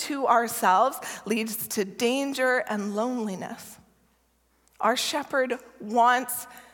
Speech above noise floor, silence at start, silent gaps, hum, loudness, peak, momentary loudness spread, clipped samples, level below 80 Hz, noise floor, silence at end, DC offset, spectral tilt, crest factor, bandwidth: 41 dB; 0 s; none; none; -26 LUFS; -8 dBFS; 12 LU; under 0.1%; -72 dBFS; -67 dBFS; 0.15 s; under 0.1%; -3 dB/octave; 18 dB; 17.5 kHz